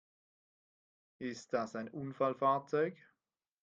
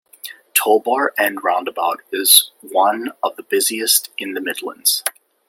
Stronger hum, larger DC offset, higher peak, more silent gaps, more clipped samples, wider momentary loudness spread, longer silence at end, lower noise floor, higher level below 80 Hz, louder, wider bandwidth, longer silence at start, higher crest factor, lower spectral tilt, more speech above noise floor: neither; neither; second, -18 dBFS vs 0 dBFS; neither; neither; about the same, 12 LU vs 14 LU; first, 0.7 s vs 0.4 s; first, -89 dBFS vs -38 dBFS; second, -84 dBFS vs -74 dBFS; second, -37 LUFS vs -17 LUFS; second, 9 kHz vs 17 kHz; first, 1.2 s vs 0.25 s; about the same, 20 dB vs 18 dB; first, -6 dB/octave vs 0.5 dB/octave; first, 53 dB vs 20 dB